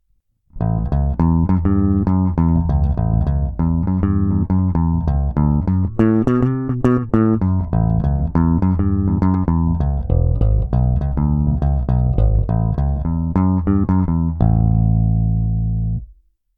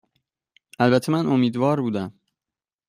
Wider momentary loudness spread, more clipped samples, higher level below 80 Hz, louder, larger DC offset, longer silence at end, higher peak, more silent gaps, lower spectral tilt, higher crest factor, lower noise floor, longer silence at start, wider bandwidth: second, 4 LU vs 9 LU; neither; first, -22 dBFS vs -64 dBFS; first, -18 LUFS vs -21 LUFS; neither; second, 0.45 s vs 0.8 s; first, -2 dBFS vs -6 dBFS; neither; first, -12 dB/octave vs -7 dB/octave; about the same, 14 dB vs 18 dB; second, -63 dBFS vs under -90 dBFS; second, 0.55 s vs 0.8 s; second, 3.1 kHz vs 15 kHz